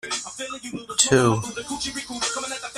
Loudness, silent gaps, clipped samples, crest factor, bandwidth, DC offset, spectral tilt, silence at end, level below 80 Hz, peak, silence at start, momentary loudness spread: -23 LUFS; none; under 0.1%; 22 dB; 14.5 kHz; under 0.1%; -3 dB/octave; 0 s; -54 dBFS; -4 dBFS; 0.05 s; 15 LU